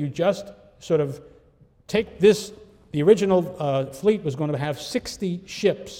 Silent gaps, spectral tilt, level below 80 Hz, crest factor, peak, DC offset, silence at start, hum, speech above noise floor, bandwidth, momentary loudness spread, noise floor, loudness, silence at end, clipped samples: none; -6 dB/octave; -56 dBFS; 20 dB; -4 dBFS; under 0.1%; 0 s; none; 34 dB; 16 kHz; 13 LU; -56 dBFS; -23 LUFS; 0 s; under 0.1%